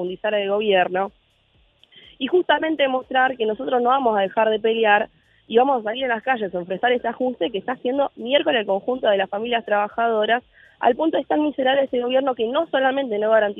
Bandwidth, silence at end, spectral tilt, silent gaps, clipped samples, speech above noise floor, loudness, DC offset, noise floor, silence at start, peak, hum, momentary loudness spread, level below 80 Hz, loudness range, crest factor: 3.9 kHz; 0 s; -7.5 dB/octave; none; under 0.1%; 40 dB; -21 LUFS; under 0.1%; -60 dBFS; 0 s; -4 dBFS; none; 6 LU; -64 dBFS; 2 LU; 18 dB